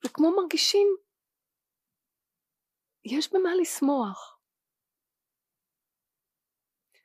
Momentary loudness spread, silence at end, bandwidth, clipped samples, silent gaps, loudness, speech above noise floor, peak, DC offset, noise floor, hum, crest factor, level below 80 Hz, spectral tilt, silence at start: 12 LU; 2.8 s; 15.5 kHz; under 0.1%; none; -25 LUFS; 64 dB; -12 dBFS; under 0.1%; -89 dBFS; none; 18 dB; under -90 dBFS; -2.5 dB/octave; 0.05 s